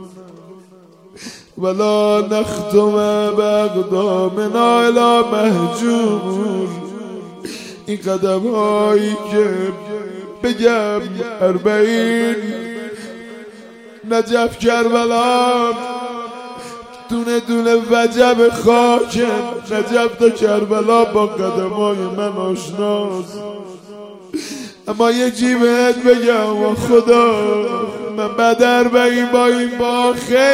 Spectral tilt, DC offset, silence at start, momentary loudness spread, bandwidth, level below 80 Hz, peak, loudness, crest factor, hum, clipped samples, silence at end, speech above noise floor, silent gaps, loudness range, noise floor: -5 dB/octave; under 0.1%; 0 s; 17 LU; 16 kHz; -54 dBFS; 0 dBFS; -15 LUFS; 16 dB; none; under 0.1%; 0 s; 30 dB; none; 5 LU; -44 dBFS